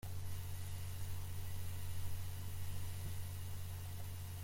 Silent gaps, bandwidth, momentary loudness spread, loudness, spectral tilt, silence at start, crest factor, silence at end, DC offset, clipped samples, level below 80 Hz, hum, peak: none; 16.5 kHz; 1 LU; -47 LUFS; -4.5 dB/octave; 0.05 s; 12 dB; 0 s; under 0.1%; under 0.1%; -54 dBFS; none; -30 dBFS